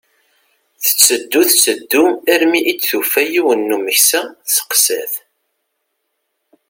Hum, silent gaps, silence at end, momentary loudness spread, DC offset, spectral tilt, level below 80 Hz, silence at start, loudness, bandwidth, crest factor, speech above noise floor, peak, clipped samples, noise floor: none; none; 1.5 s; 7 LU; under 0.1%; 0 dB/octave; -66 dBFS; 0.8 s; -13 LUFS; over 20 kHz; 16 dB; 57 dB; 0 dBFS; under 0.1%; -71 dBFS